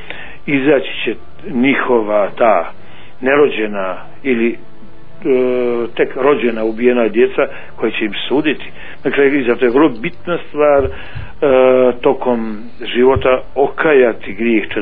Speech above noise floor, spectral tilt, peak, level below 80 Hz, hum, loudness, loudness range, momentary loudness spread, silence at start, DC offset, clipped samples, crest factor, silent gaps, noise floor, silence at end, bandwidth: 26 dB; -9.5 dB/octave; 0 dBFS; -42 dBFS; none; -14 LUFS; 3 LU; 12 LU; 0 s; 6%; under 0.1%; 14 dB; none; -40 dBFS; 0 s; 4.5 kHz